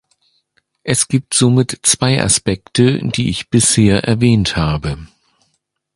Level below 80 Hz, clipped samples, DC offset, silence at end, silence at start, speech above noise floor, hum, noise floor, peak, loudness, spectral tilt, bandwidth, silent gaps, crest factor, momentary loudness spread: -36 dBFS; under 0.1%; under 0.1%; 0.9 s; 0.85 s; 53 dB; none; -67 dBFS; 0 dBFS; -14 LUFS; -4.5 dB/octave; 11.5 kHz; none; 16 dB; 6 LU